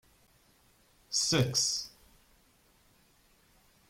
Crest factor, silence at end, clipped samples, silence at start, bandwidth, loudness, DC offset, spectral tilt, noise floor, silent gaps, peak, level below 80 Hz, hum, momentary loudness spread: 22 dB; 2 s; under 0.1%; 1.1 s; 16.5 kHz; -29 LUFS; under 0.1%; -3 dB/octave; -66 dBFS; none; -14 dBFS; -64 dBFS; none; 9 LU